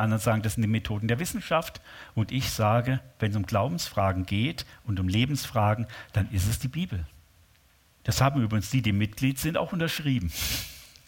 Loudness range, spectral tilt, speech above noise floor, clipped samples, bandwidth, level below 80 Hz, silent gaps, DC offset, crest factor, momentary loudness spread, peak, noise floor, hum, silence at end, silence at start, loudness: 2 LU; -5.5 dB/octave; 34 dB; under 0.1%; 17 kHz; -46 dBFS; none; under 0.1%; 20 dB; 8 LU; -6 dBFS; -61 dBFS; none; 0.2 s; 0 s; -28 LUFS